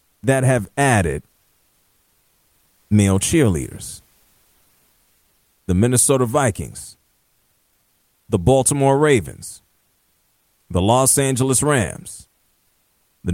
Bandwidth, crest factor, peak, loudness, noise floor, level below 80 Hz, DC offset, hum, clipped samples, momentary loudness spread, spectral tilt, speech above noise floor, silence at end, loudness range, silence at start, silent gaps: 16.5 kHz; 18 dB; -2 dBFS; -17 LUFS; -64 dBFS; -42 dBFS; under 0.1%; none; under 0.1%; 20 LU; -5 dB/octave; 46 dB; 0 s; 4 LU; 0.25 s; none